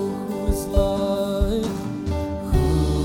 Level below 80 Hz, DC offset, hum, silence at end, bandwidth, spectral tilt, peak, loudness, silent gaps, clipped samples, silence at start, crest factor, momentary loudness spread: -28 dBFS; under 0.1%; none; 0 s; 17 kHz; -7 dB/octave; -6 dBFS; -23 LUFS; none; under 0.1%; 0 s; 16 dB; 6 LU